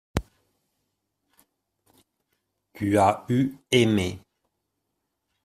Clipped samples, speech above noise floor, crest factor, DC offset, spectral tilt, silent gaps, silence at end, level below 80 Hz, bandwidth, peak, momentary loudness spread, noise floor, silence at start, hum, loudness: under 0.1%; 57 dB; 24 dB; under 0.1%; -5.5 dB/octave; none; 1.25 s; -50 dBFS; 15 kHz; -4 dBFS; 13 LU; -80 dBFS; 0.15 s; none; -24 LUFS